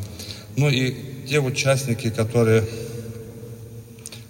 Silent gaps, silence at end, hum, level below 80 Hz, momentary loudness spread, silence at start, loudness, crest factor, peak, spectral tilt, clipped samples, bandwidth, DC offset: none; 0 s; none; -52 dBFS; 19 LU; 0 s; -22 LUFS; 18 dB; -6 dBFS; -5.5 dB/octave; under 0.1%; 16.5 kHz; under 0.1%